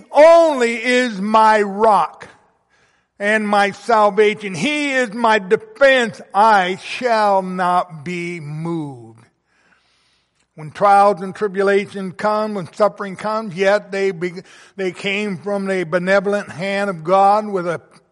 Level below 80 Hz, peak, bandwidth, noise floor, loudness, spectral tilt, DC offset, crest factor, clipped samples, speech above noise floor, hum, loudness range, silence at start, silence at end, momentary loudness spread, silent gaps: -62 dBFS; -2 dBFS; 11.5 kHz; -63 dBFS; -17 LUFS; -5 dB/octave; under 0.1%; 14 dB; under 0.1%; 46 dB; none; 5 LU; 0.1 s; 0.3 s; 13 LU; none